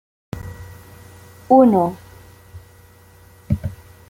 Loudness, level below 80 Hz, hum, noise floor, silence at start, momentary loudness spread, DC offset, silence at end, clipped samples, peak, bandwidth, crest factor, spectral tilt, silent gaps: -17 LUFS; -44 dBFS; none; -47 dBFS; 0.35 s; 26 LU; under 0.1%; 0.35 s; under 0.1%; -2 dBFS; 16.5 kHz; 20 dB; -9 dB/octave; none